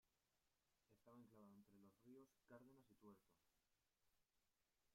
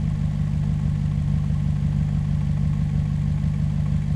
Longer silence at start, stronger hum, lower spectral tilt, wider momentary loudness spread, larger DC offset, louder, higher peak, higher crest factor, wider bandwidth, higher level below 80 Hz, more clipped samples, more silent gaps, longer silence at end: about the same, 0.05 s vs 0 s; second, none vs 50 Hz at -30 dBFS; second, -6.5 dB/octave vs -9 dB/octave; about the same, 1 LU vs 1 LU; neither; second, -69 LUFS vs -23 LUFS; second, -54 dBFS vs -12 dBFS; first, 18 dB vs 10 dB; first, 15 kHz vs 8 kHz; second, under -90 dBFS vs -30 dBFS; neither; neither; about the same, 0 s vs 0 s